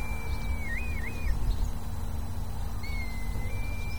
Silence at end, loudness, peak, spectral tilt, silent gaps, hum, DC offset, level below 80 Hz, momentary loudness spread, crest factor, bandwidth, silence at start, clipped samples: 0 s; -35 LUFS; -16 dBFS; -5.5 dB/octave; none; none; 2%; -34 dBFS; 4 LU; 14 dB; over 20 kHz; 0 s; under 0.1%